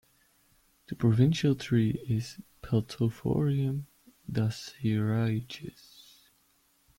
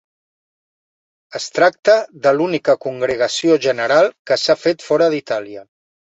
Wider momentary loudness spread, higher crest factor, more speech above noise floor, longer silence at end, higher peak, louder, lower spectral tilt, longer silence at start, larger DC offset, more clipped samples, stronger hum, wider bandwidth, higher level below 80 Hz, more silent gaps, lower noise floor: first, 18 LU vs 10 LU; about the same, 18 dB vs 16 dB; second, 40 dB vs over 74 dB; first, 1.3 s vs 0.45 s; second, -12 dBFS vs -2 dBFS; second, -29 LUFS vs -16 LUFS; first, -7.5 dB/octave vs -4 dB/octave; second, 0.9 s vs 1.3 s; neither; neither; neither; first, 16.5 kHz vs 8.2 kHz; about the same, -58 dBFS vs -62 dBFS; second, none vs 1.79-1.83 s, 4.19-4.25 s; second, -68 dBFS vs under -90 dBFS